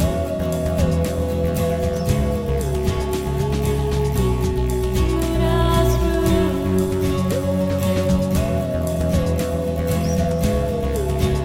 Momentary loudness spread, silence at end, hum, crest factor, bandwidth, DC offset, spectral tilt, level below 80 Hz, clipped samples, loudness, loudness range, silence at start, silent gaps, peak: 4 LU; 0 s; none; 14 dB; 17 kHz; under 0.1%; -6.5 dB/octave; -26 dBFS; under 0.1%; -20 LUFS; 2 LU; 0 s; none; -4 dBFS